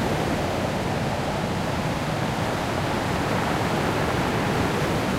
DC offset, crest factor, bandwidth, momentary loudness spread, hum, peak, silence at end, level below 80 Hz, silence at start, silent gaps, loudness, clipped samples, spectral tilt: under 0.1%; 14 dB; 16 kHz; 2 LU; none; -10 dBFS; 0 s; -40 dBFS; 0 s; none; -25 LUFS; under 0.1%; -5.5 dB/octave